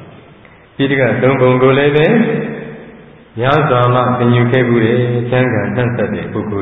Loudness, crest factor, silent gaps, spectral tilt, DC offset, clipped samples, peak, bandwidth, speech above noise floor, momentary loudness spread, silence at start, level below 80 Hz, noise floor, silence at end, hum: -13 LUFS; 14 dB; none; -10 dB/octave; under 0.1%; under 0.1%; 0 dBFS; 4 kHz; 29 dB; 10 LU; 0 s; -44 dBFS; -41 dBFS; 0 s; none